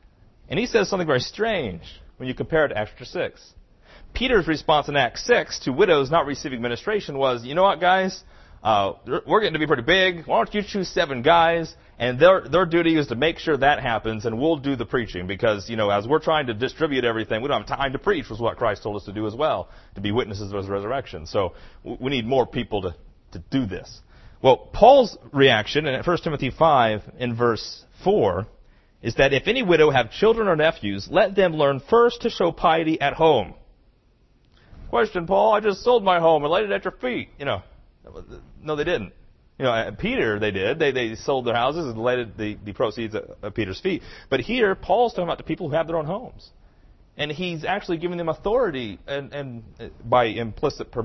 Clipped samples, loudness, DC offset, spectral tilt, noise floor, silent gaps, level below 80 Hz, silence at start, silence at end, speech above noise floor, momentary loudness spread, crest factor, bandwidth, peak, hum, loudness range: under 0.1%; -22 LUFS; under 0.1%; -5.5 dB/octave; -59 dBFS; none; -46 dBFS; 0.5 s; 0 s; 37 dB; 13 LU; 22 dB; 6.2 kHz; 0 dBFS; none; 7 LU